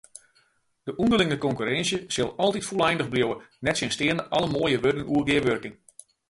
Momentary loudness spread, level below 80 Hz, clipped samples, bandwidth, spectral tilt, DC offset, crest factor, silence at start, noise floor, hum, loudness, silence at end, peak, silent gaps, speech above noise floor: 6 LU; -54 dBFS; under 0.1%; 11.5 kHz; -4.5 dB/octave; under 0.1%; 18 dB; 0.85 s; -66 dBFS; none; -25 LUFS; 0.55 s; -8 dBFS; none; 41 dB